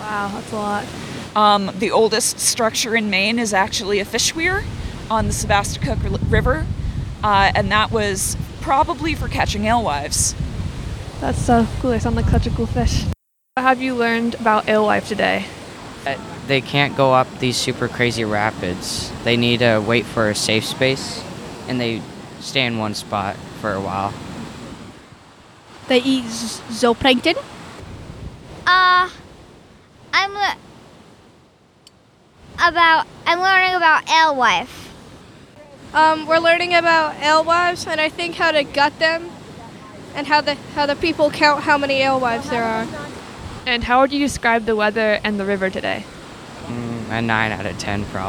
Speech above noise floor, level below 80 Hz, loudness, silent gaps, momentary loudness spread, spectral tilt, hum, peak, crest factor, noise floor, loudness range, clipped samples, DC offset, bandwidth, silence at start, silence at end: 34 dB; -36 dBFS; -18 LUFS; none; 16 LU; -4 dB/octave; none; -2 dBFS; 18 dB; -52 dBFS; 6 LU; under 0.1%; under 0.1%; 19 kHz; 0 s; 0 s